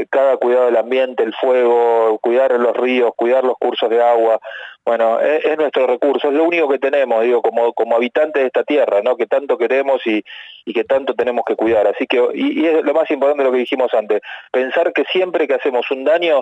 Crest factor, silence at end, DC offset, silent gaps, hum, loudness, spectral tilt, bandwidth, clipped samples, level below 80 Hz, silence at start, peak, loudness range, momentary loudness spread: 12 dB; 0 s; under 0.1%; none; none; -16 LUFS; -5 dB/octave; 8 kHz; under 0.1%; -66 dBFS; 0 s; -2 dBFS; 2 LU; 5 LU